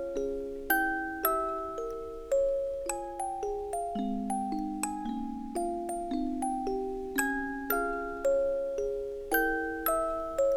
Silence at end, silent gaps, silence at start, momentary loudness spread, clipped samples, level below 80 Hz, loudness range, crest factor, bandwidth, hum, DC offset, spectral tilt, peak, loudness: 0 s; none; 0 s; 7 LU; under 0.1%; -50 dBFS; 3 LU; 20 dB; 18.5 kHz; none; under 0.1%; -4 dB/octave; -12 dBFS; -32 LUFS